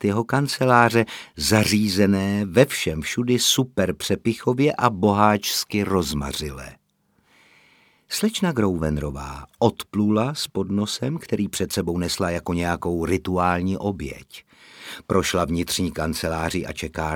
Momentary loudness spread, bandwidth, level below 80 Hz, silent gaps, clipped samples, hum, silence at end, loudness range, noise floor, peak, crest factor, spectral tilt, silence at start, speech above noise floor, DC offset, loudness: 10 LU; 18.5 kHz; -44 dBFS; none; under 0.1%; none; 0 s; 6 LU; -65 dBFS; 0 dBFS; 22 dB; -4.5 dB/octave; 0 s; 44 dB; under 0.1%; -22 LUFS